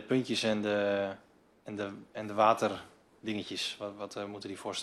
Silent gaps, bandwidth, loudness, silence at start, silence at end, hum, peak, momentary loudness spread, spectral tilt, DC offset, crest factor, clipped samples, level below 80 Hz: none; 14 kHz; -33 LUFS; 0 s; 0 s; none; -10 dBFS; 16 LU; -4.5 dB/octave; under 0.1%; 22 dB; under 0.1%; -74 dBFS